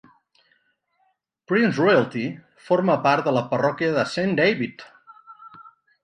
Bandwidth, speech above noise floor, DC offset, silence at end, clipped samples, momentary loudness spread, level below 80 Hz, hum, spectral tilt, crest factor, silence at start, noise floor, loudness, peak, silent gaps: 10 kHz; 48 dB; under 0.1%; 0.35 s; under 0.1%; 10 LU; -66 dBFS; none; -6.5 dB/octave; 18 dB; 1.5 s; -69 dBFS; -21 LUFS; -4 dBFS; none